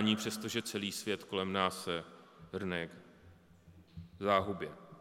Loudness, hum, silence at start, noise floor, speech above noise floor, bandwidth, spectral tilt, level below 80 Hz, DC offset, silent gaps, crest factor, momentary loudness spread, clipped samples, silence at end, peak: -36 LUFS; none; 0 s; -61 dBFS; 25 dB; 17 kHz; -4 dB/octave; -72 dBFS; under 0.1%; none; 24 dB; 21 LU; under 0.1%; 0 s; -14 dBFS